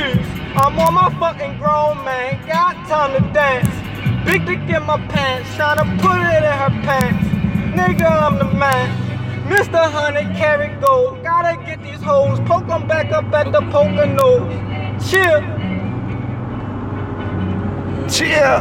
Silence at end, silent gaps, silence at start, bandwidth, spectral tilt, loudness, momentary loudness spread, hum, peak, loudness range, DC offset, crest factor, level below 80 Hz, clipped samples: 0 s; none; 0 s; 17 kHz; -6 dB/octave; -16 LUFS; 10 LU; none; -2 dBFS; 2 LU; under 0.1%; 16 dB; -38 dBFS; under 0.1%